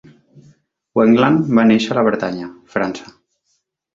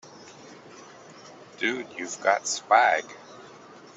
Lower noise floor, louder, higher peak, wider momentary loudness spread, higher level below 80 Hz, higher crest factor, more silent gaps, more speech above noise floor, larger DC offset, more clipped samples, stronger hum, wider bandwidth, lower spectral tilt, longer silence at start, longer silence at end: first, -68 dBFS vs -48 dBFS; first, -16 LUFS vs -24 LUFS; first, -2 dBFS vs -6 dBFS; second, 12 LU vs 27 LU; first, -56 dBFS vs -80 dBFS; second, 16 dB vs 22 dB; neither; first, 53 dB vs 24 dB; neither; neither; neither; second, 7.4 kHz vs 8.2 kHz; first, -7 dB/octave vs -1.5 dB/octave; first, 0.95 s vs 0.15 s; first, 0.9 s vs 0.4 s